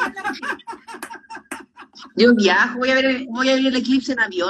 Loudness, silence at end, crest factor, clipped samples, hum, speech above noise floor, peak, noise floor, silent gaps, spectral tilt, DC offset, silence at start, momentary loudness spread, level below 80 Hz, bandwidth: -18 LUFS; 0 s; 18 dB; under 0.1%; none; 26 dB; -2 dBFS; -43 dBFS; none; -4 dB/octave; under 0.1%; 0 s; 20 LU; -60 dBFS; 12.5 kHz